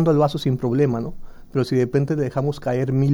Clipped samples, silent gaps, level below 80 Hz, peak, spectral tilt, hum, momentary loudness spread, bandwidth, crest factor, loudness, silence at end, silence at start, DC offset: under 0.1%; none; -44 dBFS; -6 dBFS; -8.5 dB/octave; none; 7 LU; 12 kHz; 14 dB; -21 LUFS; 0 s; 0 s; under 0.1%